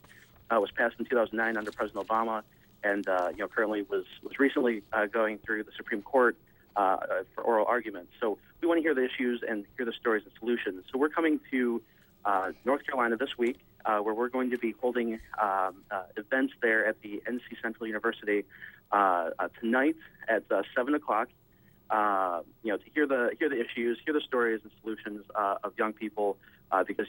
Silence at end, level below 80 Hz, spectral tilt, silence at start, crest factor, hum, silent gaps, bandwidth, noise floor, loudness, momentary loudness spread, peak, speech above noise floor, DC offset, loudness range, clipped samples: 0 s; -68 dBFS; -5.5 dB/octave; 0.5 s; 20 dB; none; none; 16.5 kHz; -61 dBFS; -30 LUFS; 9 LU; -12 dBFS; 31 dB; under 0.1%; 2 LU; under 0.1%